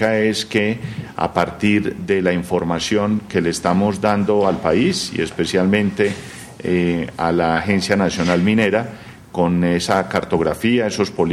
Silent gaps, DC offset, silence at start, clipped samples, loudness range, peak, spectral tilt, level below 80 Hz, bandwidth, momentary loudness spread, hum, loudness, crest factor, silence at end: none; under 0.1%; 0 s; under 0.1%; 1 LU; 0 dBFS; -5.5 dB/octave; -46 dBFS; 14.5 kHz; 5 LU; none; -18 LUFS; 16 dB; 0 s